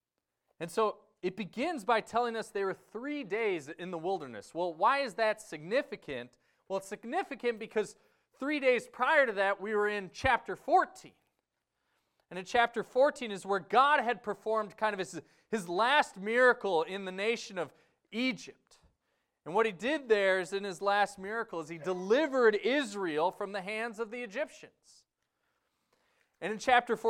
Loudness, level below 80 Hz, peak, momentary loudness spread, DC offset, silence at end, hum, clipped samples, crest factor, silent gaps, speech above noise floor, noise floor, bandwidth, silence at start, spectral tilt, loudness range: -32 LUFS; -66 dBFS; -12 dBFS; 13 LU; under 0.1%; 0 s; none; under 0.1%; 20 dB; none; 53 dB; -85 dBFS; 15 kHz; 0.6 s; -4 dB/octave; 5 LU